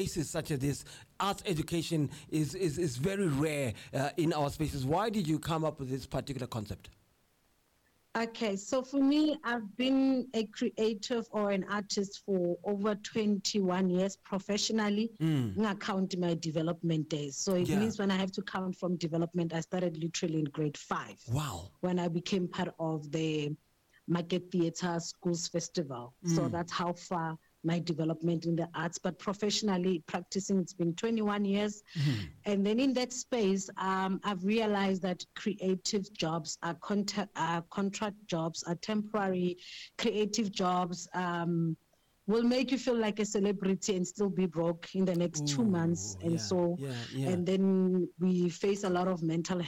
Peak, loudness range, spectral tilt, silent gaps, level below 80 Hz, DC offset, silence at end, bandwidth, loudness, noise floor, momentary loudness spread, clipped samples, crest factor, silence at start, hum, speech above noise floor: -22 dBFS; 3 LU; -5.5 dB/octave; none; -62 dBFS; under 0.1%; 0 s; 15.5 kHz; -33 LUFS; -72 dBFS; 7 LU; under 0.1%; 12 dB; 0 s; none; 39 dB